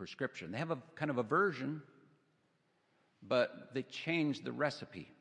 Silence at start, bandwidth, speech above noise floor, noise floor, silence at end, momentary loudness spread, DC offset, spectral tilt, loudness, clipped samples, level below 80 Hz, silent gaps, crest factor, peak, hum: 0 s; 10 kHz; 39 dB; -76 dBFS; 0.1 s; 11 LU; under 0.1%; -6 dB/octave; -37 LUFS; under 0.1%; -82 dBFS; none; 20 dB; -18 dBFS; none